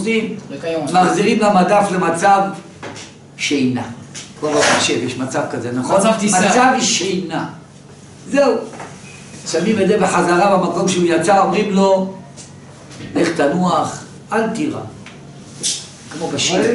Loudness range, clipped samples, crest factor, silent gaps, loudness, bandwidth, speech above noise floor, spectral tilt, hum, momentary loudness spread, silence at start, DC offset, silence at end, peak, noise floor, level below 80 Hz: 5 LU; under 0.1%; 14 dB; none; -16 LUFS; 11.5 kHz; 24 dB; -4 dB/octave; none; 20 LU; 0 s; under 0.1%; 0 s; -2 dBFS; -39 dBFS; -56 dBFS